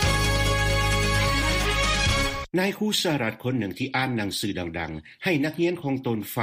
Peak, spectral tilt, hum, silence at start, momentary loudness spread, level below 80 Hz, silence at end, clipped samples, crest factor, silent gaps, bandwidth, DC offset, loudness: -10 dBFS; -4 dB/octave; none; 0 s; 7 LU; -32 dBFS; 0 s; under 0.1%; 14 dB; none; 15.5 kHz; under 0.1%; -24 LUFS